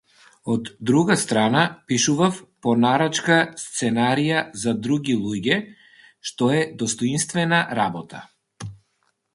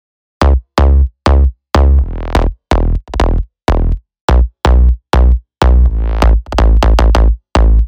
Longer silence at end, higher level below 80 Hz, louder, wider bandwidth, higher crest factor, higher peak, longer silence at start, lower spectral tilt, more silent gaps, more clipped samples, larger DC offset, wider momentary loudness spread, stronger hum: first, 0.6 s vs 0 s; second, -60 dBFS vs -10 dBFS; second, -21 LUFS vs -13 LUFS; first, 11.5 kHz vs 8.4 kHz; first, 20 dB vs 10 dB; about the same, -2 dBFS vs 0 dBFS; about the same, 0.45 s vs 0.4 s; second, -4.5 dB/octave vs -7 dB/octave; second, none vs 4.21-4.28 s; neither; neither; first, 16 LU vs 6 LU; neither